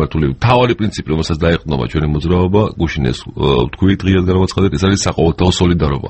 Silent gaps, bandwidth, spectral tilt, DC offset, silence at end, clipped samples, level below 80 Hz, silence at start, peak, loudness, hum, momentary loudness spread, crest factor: none; 8.6 kHz; -6 dB/octave; under 0.1%; 0 s; under 0.1%; -28 dBFS; 0 s; 0 dBFS; -14 LUFS; none; 5 LU; 14 dB